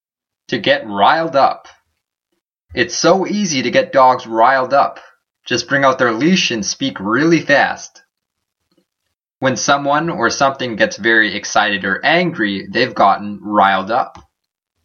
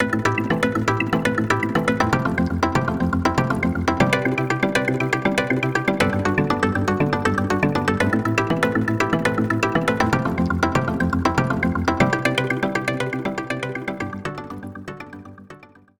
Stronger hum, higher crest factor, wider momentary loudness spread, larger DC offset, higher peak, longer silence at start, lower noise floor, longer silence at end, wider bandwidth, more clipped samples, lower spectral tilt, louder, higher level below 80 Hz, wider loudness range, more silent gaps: neither; about the same, 16 dB vs 18 dB; about the same, 7 LU vs 8 LU; neither; first, 0 dBFS vs -4 dBFS; first, 0.5 s vs 0 s; first, -77 dBFS vs -45 dBFS; first, 0.65 s vs 0.35 s; second, 7.2 kHz vs over 20 kHz; neither; second, -4 dB/octave vs -6 dB/octave; first, -15 LUFS vs -21 LUFS; second, -56 dBFS vs -44 dBFS; about the same, 3 LU vs 3 LU; neither